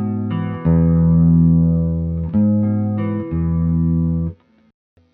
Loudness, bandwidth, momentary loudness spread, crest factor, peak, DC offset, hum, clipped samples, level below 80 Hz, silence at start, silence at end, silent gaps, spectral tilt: -17 LUFS; 3 kHz; 9 LU; 12 dB; -4 dBFS; under 0.1%; none; under 0.1%; -30 dBFS; 0 s; 0.8 s; none; -11.5 dB/octave